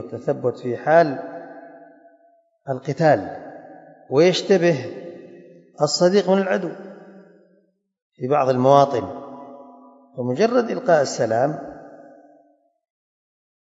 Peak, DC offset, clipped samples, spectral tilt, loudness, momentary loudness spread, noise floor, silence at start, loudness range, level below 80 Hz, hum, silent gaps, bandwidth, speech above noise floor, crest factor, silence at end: 0 dBFS; under 0.1%; under 0.1%; -5.5 dB/octave; -19 LUFS; 23 LU; -63 dBFS; 0 s; 3 LU; -70 dBFS; none; 8.02-8.10 s; 8 kHz; 44 dB; 22 dB; 1.75 s